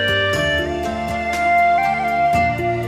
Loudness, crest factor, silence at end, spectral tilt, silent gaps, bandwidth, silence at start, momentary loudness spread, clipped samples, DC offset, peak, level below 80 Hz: -18 LUFS; 12 dB; 0 s; -5 dB/octave; none; 15.5 kHz; 0 s; 8 LU; under 0.1%; under 0.1%; -6 dBFS; -38 dBFS